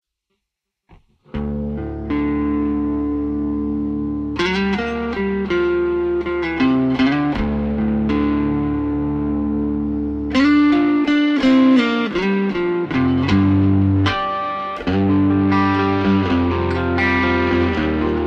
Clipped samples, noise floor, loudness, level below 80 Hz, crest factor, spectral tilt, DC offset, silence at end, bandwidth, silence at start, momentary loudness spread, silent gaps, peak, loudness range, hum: under 0.1%; -80 dBFS; -18 LUFS; -36 dBFS; 14 dB; -7.5 dB/octave; under 0.1%; 0 s; 7.6 kHz; 1.35 s; 8 LU; none; -4 dBFS; 5 LU; none